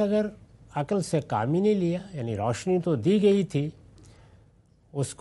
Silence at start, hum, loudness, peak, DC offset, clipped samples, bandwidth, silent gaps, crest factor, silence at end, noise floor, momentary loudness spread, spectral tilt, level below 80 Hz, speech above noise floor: 0 s; none; -26 LUFS; -10 dBFS; under 0.1%; under 0.1%; 11.5 kHz; none; 16 dB; 0.1 s; -59 dBFS; 12 LU; -7 dB/octave; -60 dBFS; 34 dB